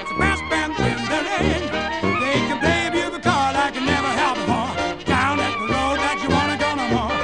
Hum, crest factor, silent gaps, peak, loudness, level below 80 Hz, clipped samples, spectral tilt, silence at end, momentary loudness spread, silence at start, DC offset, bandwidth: none; 16 dB; none; -6 dBFS; -20 LUFS; -38 dBFS; under 0.1%; -4.5 dB/octave; 0 s; 3 LU; 0 s; 0.4%; 11 kHz